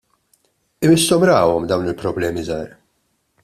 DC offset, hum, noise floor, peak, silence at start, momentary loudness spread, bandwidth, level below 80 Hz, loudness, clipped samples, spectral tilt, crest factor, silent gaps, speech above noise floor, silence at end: under 0.1%; none; -67 dBFS; -2 dBFS; 0.8 s; 13 LU; 14 kHz; -50 dBFS; -17 LUFS; under 0.1%; -5 dB/octave; 18 dB; none; 51 dB; 0.75 s